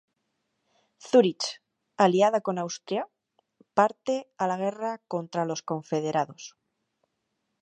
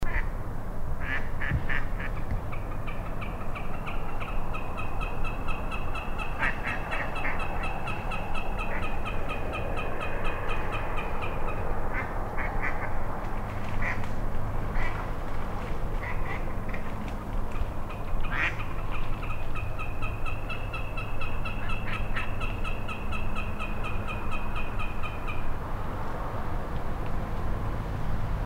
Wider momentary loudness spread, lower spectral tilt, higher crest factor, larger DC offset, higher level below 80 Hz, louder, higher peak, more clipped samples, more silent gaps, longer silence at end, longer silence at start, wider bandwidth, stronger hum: first, 12 LU vs 5 LU; second, -5 dB/octave vs -6.5 dB/octave; first, 22 dB vs 14 dB; neither; second, -80 dBFS vs -32 dBFS; first, -27 LUFS vs -34 LUFS; first, -6 dBFS vs -14 dBFS; neither; neither; first, 1.15 s vs 0 s; first, 1.05 s vs 0 s; first, 9.2 kHz vs 5.4 kHz; neither